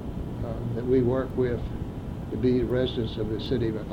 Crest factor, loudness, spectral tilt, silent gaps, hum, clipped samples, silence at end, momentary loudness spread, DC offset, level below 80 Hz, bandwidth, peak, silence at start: 14 dB; -28 LUFS; -8.5 dB/octave; none; none; under 0.1%; 0 s; 11 LU; under 0.1%; -38 dBFS; 9.4 kHz; -12 dBFS; 0 s